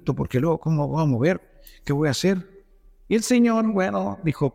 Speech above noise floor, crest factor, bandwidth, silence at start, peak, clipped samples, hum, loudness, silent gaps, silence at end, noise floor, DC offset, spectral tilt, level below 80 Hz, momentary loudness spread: 30 dB; 14 dB; 16 kHz; 0.05 s; -8 dBFS; under 0.1%; none; -22 LUFS; none; 0.05 s; -52 dBFS; under 0.1%; -6.5 dB/octave; -48 dBFS; 8 LU